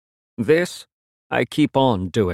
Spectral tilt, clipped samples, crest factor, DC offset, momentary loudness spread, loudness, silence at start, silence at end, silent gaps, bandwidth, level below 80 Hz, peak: -6 dB/octave; under 0.1%; 16 dB; under 0.1%; 13 LU; -20 LUFS; 0.4 s; 0 s; 0.93-1.30 s; 14.5 kHz; -54 dBFS; -4 dBFS